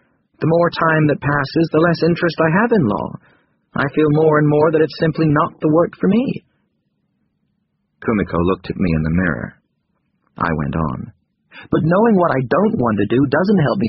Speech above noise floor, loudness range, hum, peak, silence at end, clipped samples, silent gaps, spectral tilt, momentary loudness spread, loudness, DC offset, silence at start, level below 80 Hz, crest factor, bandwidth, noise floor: 52 dB; 6 LU; none; -2 dBFS; 0 s; under 0.1%; none; -6.5 dB/octave; 9 LU; -16 LUFS; under 0.1%; 0.4 s; -42 dBFS; 16 dB; 5.8 kHz; -68 dBFS